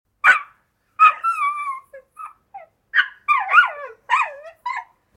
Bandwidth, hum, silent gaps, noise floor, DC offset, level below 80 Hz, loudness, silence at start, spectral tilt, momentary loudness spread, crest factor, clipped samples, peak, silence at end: 12.5 kHz; none; none; -60 dBFS; under 0.1%; -72 dBFS; -18 LUFS; 0.25 s; 1 dB/octave; 21 LU; 20 dB; under 0.1%; 0 dBFS; 0.35 s